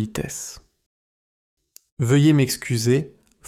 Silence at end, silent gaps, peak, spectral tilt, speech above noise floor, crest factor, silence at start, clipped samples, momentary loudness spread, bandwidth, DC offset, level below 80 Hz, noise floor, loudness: 0.4 s; 0.86-1.57 s, 1.92-1.97 s; -6 dBFS; -5.5 dB/octave; over 70 dB; 16 dB; 0 s; under 0.1%; 17 LU; 16 kHz; under 0.1%; -52 dBFS; under -90 dBFS; -20 LUFS